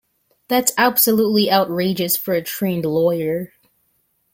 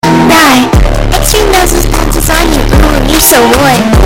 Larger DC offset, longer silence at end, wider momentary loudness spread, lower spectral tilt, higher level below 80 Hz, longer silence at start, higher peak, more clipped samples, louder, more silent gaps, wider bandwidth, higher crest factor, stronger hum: neither; first, 0.9 s vs 0 s; about the same, 8 LU vs 6 LU; about the same, -4 dB/octave vs -4 dB/octave; second, -60 dBFS vs -12 dBFS; first, 0.5 s vs 0.05 s; about the same, 0 dBFS vs 0 dBFS; second, under 0.1% vs 1%; second, -18 LUFS vs -6 LUFS; neither; second, 17 kHz vs over 20 kHz; first, 20 dB vs 6 dB; neither